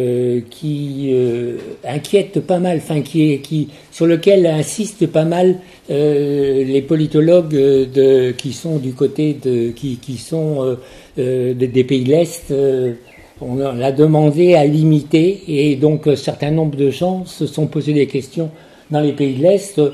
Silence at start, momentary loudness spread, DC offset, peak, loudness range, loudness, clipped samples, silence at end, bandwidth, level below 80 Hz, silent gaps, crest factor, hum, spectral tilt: 0 s; 11 LU; under 0.1%; 0 dBFS; 4 LU; -16 LUFS; under 0.1%; 0 s; 13.5 kHz; -52 dBFS; none; 16 dB; none; -7 dB/octave